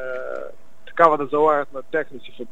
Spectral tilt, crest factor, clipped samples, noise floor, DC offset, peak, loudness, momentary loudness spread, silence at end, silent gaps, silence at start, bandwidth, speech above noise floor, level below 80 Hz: -6.5 dB/octave; 22 dB; under 0.1%; -45 dBFS; 2%; 0 dBFS; -20 LUFS; 18 LU; 0.05 s; none; 0 s; 8 kHz; 25 dB; -64 dBFS